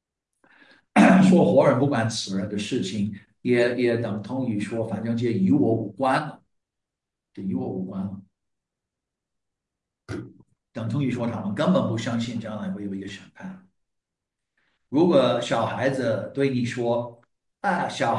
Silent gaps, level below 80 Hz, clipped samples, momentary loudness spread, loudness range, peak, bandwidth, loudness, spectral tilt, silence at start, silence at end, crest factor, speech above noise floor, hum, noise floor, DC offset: none; -66 dBFS; under 0.1%; 17 LU; 14 LU; -4 dBFS; 11 kHz; -23 LUFS; -6.5 dB/octave; 0.95 s; 0 s; 20 dB; 62 dB; none; -86 dBFS; under 0.1%